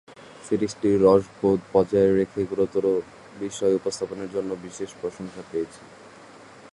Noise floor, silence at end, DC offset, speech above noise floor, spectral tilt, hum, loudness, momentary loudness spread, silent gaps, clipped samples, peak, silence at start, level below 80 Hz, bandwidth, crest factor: -47 dBFS; 0.05 s; under 0.1%; 23 dB; -6.5 dB/octave; none; -24 LUFS; 15 LU; none; under 0.1%; -4 dBFS; 0.1 s; -56 dBFS; 11.5 kHz; 20 dB